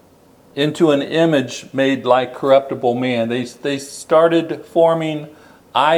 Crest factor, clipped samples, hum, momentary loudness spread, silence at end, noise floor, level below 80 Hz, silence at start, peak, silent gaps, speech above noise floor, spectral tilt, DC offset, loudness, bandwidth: 16 dB; under 0.1%; none; 9 LU; 0 s; -49 dBFS; -64 dBFS; 0.55 s; 0 dBFS; none; 33 dB; -5.5 dB/octave; under 0.1%; -17 LUFS; 14.5 kHz